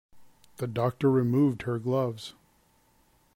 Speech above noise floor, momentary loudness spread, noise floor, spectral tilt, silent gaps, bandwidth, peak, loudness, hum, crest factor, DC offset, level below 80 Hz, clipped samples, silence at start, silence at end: 39 dB; 14 LU; -65 dBFS; -8 dB/octave; none; 16 kHz; -14 dBFS; -28 LUFS; none; 16 dB; under 0.1%; -64 dBFS; under 0.1%; 0.15 s; 1.05 s